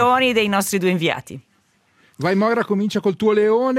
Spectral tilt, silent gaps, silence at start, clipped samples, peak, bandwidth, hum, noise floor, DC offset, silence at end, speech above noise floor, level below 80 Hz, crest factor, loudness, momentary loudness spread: -5 dB/octave; none; 0 s; under 0.1%; -4 dBFS; 16 kHz; none; -61 dBFS; under 0.1%; 0 s; 43 dB; -62 dBFS; 16 dB; -19 LUFS; 10 LU